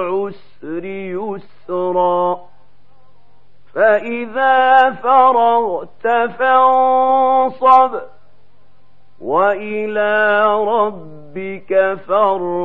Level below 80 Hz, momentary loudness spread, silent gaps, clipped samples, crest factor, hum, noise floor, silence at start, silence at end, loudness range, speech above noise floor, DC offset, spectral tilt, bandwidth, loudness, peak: -64 dBFS; 16 LU; none; under 0.1%; 16 dB; none; -56 dBFS; 0 s; 0 s; 7 LU; 42 dB; 2%; -7 dB/octave; 4.7 kHz; -15 LUFS; 0 dBFS